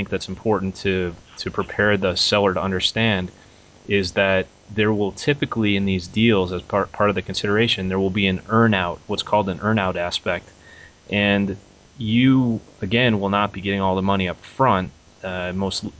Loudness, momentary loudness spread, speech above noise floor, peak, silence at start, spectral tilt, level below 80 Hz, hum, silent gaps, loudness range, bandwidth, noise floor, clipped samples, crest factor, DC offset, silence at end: -21 LUFS; 9 LU; 26 dB; -4 dBFS; 0 s; -5.5 dB/octave; -44 dBFS; none; none; 2 LU; 8 kHz; -46 dBFS; under 0.1%; 16 dB; under 0.1%; 0.1 s